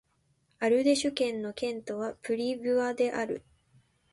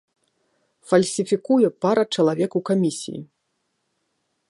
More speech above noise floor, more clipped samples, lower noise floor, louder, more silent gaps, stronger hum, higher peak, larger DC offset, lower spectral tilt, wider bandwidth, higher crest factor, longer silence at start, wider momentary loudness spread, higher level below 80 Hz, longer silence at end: second, 42 dB vs 53 dB; neither; about the same, -71 dBFS vs -74 dBFS; second, -30 LUFS vs -21 LUFS; neither; neither; second, -12 dBFS vs -2 dBFS; neither; second, -3.5 dB/octave vs -5.5 dB/octave; about the same, 11.5 kHz vs 11.5 kHz; about the same, 18 dB vs 20 dB; second, 0.6 s vs 0.9 s; about the same, 10 LU vs 10 LU; about the same, -68 dBFS vs -70 dBFS; second, 0.75 s vs 1.25 s